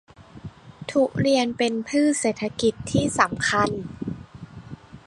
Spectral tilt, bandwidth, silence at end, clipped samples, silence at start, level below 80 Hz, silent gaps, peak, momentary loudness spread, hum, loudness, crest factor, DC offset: -4.5 dB/octave; 11.5 kHz; 0.1 s; under 0.1%; 0.2 s; -50 dBFS; none; -2 dBFS; 22 LU; none; -23 LUFS; 22 dB; under 0.1%